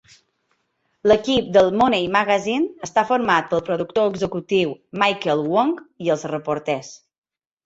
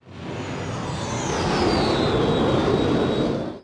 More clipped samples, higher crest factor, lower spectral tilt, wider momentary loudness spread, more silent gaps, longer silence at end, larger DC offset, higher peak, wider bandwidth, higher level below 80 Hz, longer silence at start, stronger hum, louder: neither; about the same, 18 dB vs 16 dB; about the same, -5 dB/octave vs -5.5 dB/octave; about the same, 8 LU vs 9 LU; neither; first, 0.7 s vs 0.05 s; neither; first, -2 dBFS vs -8 dBFS; second, 8 kHz vs 10.5 kHz; second, -54 dBFS vs -40 dBFS; first, 1.05 s vs 0.05 s; neither; about the same, -20 LUFS vs -22 LUFS